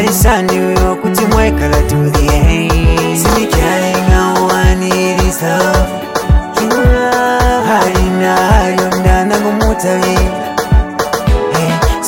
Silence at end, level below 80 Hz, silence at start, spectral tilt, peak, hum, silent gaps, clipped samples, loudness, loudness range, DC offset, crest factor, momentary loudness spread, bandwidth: 0 s; -16 dBFS; 0 s; -5 dB/octave; 0 dBFS; none; none; under 0.1%; -11 LUFS; 1 LU; under 0.1%; 10 dB; 3 LU; 17 kHz